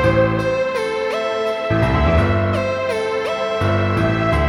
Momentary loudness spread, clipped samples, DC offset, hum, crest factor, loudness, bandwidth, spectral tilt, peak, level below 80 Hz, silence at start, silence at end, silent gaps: 5 LU; under 0.1%; under 0.1%; none; 14 dB; -18 LUFS; 12.5 kHz; -7 dB/octave; -4 dBFS; -30 dBFS; 0 s; 0 s; none